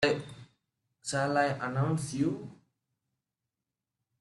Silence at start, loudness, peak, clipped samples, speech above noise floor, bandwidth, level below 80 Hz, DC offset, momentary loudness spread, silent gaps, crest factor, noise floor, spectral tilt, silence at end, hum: 0 s; -31 LUFS; -12 dBFS; under 0.1%; 59 dB; 12 kHz; -68 dBFS; under 0.1%; 13 LU; none; 22 dB; -89 dBFS; -5.5 dB/octave; 1.65 s; none